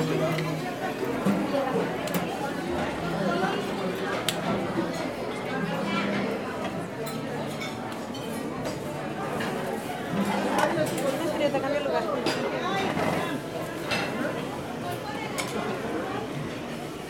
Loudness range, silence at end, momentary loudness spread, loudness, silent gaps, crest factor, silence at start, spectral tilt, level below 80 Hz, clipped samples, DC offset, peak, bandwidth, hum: 4 LU; 0 s; 7 LU; -29 LUFS; none; 22 dB; 0 s; -5 dB/octave; -56 dBFS; under 0.1%; under 0.1%; -6 dBFS; 16.5 kHz; none